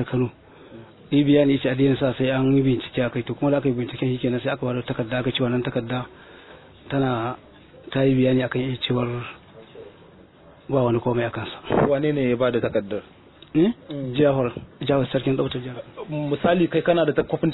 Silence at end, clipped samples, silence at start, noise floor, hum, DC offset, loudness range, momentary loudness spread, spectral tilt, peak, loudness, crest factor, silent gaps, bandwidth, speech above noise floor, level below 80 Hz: 0 s; under 0.1%; 0 s; -49 dBFS; none; under 0.1%; 5 LU; 11 LU; -10.5 dB/octave; -6 dBFS; -23 LUFS; 18 dB; none; 4.1 kHz; 27 dB; -50 dBFS